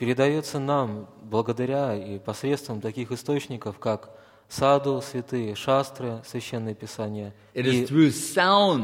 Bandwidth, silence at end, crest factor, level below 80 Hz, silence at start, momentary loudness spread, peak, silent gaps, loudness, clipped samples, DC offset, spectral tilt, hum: 16.5 kHz; 0 s; 20 dB; -64 dBFS; 0 s; 13 LU; -6 dBFS; none; -26 LUFS; under 0.1%; under 0.1%; -5.5 dB/octave; none